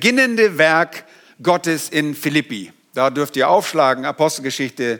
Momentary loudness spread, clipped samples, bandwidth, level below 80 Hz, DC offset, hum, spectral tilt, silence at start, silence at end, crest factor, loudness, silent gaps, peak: 10 LU; under 0.1%; 19.5 kHz; -70 dBFS; under 0.1%; none; -4 dB/octave; 0 s; 0 s; 16 dB; -17 LUFS; none; 0 dBFS